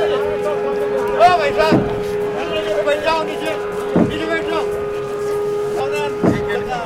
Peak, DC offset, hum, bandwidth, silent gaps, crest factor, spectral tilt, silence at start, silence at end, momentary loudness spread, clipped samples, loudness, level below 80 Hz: 0 dBFS; under 0.1%; none; 15.5 kHz; none; 16 dB; -6 dB/octave; 0 s; 0 s; 8 LU; under 0.1%; -18 LUFS; -42 dBFS